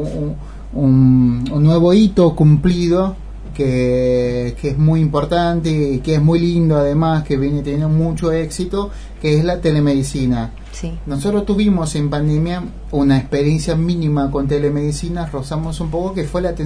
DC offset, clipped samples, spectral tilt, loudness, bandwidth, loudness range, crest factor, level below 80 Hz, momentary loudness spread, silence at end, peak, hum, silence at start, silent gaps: under 0.1%; under 0.1%; -7.5 dB/octave; -16 LUFS; 11 kHz; 5 LU; 14 dB; -30 dBFS; 11 LU; 0 s; -2 dBFS; none; 0 s; none